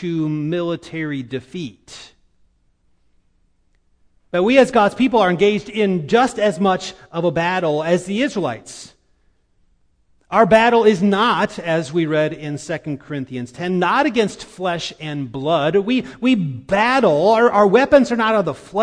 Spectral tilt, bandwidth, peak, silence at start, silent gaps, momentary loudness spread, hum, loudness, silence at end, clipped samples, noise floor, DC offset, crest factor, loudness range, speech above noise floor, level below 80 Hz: -6 dB/octave; 10.5 kHz; 0 dBFS; 0 s; none; 14 LU; none; -17 LUFS; 0 s; under 0.1%; -60 dBFS; under 0.1%; 18 dB; 8 LU; 43 dB; -52 dBFS